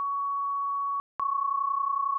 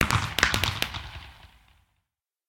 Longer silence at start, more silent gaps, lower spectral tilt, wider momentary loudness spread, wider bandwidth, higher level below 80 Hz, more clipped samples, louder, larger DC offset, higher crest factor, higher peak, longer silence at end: about the same, 0 s vs 0 s; first, 1.00-1.19 s vs none; second, 12 dB/octave vs -3 dB/octave; second, 3 LU vs 19 LU; second, 1.8 kHz vs 17 kHz; second, -80 dBFS vs -42 dBFS; neither; second, -29 LUFS vs -25 LUFS; neither; second, 8 dB vs 28 dB; second, -22 dBFS vs -2 dBFS; second, 0 s vs 1.05 s